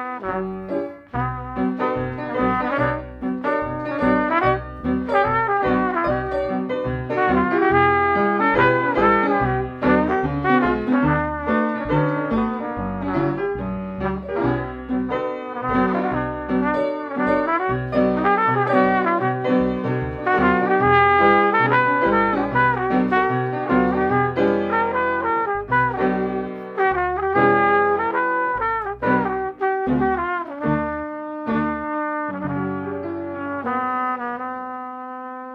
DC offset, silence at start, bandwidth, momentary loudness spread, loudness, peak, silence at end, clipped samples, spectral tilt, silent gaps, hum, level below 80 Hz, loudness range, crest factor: under 0.1%; 0 s; 5.8 kHz; 10 LU; -20 LUFS; -2 dBFS; 0 s; under 0.1%; -9 dB/octave; none; none; -42 dBFS; 7 LU; 18 dB